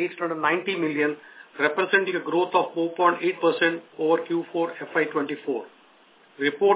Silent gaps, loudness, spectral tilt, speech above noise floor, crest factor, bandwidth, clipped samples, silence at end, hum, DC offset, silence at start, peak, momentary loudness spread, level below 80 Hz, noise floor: none; -24 LUFS; -8.5 dB/octave; 32 dB; 20 dB; 4 kHz; under 0.1%; 0 s; none; under 0.1%; 0 s; -6 dBFS; 7 LU; -82 dBFS; -56 dBFS